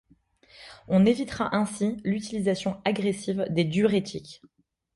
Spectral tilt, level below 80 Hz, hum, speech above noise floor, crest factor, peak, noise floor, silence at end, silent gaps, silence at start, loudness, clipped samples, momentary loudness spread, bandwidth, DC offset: -6 dB/octave; -58 dBFS; none; 35 dB; 18 dB; -10 dBFS; -60 dBFS; 0.6 s; none; 0.6 s; -26 LUFS; under 0.1%; 16 LU; 11.5 kHz; under 0.1%